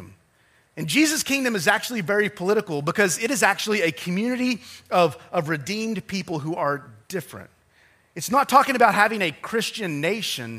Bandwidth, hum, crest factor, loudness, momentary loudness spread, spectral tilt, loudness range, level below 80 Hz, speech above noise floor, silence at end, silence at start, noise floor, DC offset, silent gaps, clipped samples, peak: 15.5 kHz; none; 22 dB; -22 LUFS; 14 LU; -3.5 dB/octave; 5 LU; -66 dBFS; 38 dB; 0 s; 0 s; -61 dBFS; under 0.1%; none; under 0.1%; -2 dBFS